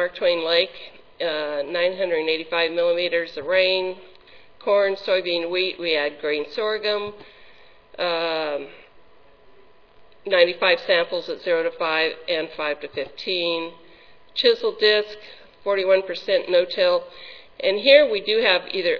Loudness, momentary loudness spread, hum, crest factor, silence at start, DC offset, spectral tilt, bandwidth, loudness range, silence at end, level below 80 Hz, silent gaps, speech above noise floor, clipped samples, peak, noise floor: -21 LUFS; 13 LU; none; 22 dB; 0 s; 0.3%; -4.5 dB/octave; 5.4 kHz; 6 LU; 0 s; -64 dBFS; none; 31 dB; under 0.1%; 0 dBFS; -53 dBFS